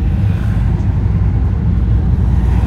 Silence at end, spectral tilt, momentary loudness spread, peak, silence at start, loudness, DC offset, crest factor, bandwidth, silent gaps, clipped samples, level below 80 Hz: 0 s; -9.5 dB/octave; 2 LU; -2 dBFS; 0 s; -15 LUFS; under 0.1%; 10 dB; 4.7 kHz; none; under 0.1%; -16 dBFS